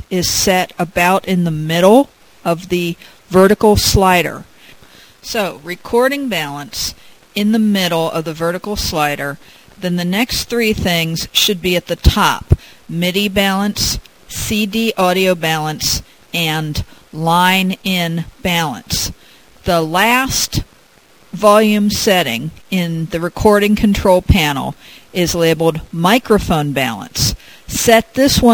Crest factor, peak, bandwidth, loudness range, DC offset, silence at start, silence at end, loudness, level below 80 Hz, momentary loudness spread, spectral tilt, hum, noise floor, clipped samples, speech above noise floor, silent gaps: 16 dB; 0 dBFS; 16 kHz; 4 LU; 0.4%; 0.1 s; 0 s; -15 LUFS; -30 dBFS; 11 LU; -4 dB/octave; none; -48 dBFS; under 0.1%; 34 dB; none